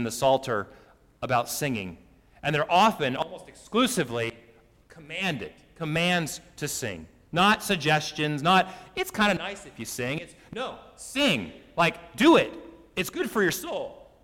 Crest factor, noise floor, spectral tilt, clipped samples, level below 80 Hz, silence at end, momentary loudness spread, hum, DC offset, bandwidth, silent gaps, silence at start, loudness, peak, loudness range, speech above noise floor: 20 dB; -56 dBFS; -4 dB/octave; under 0.1%; -58 dBFS; 0.2 s; 15 LU; none; under 0.1%; 17 kHz; none; 0 s; -26 LUFS; -8 dBFS; 4 LU; 30 dB